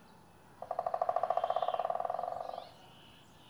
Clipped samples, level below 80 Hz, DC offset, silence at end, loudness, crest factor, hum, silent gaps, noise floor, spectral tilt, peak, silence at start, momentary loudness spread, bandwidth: under 0.1%; -74 dBFS; under 0.1%; 0 s; -36 LUFS; 22 dB; none; none; -59 dBFS; -4.5 dB/octave; -16 dBFS; 0 s; 23 LU; over 20 kHz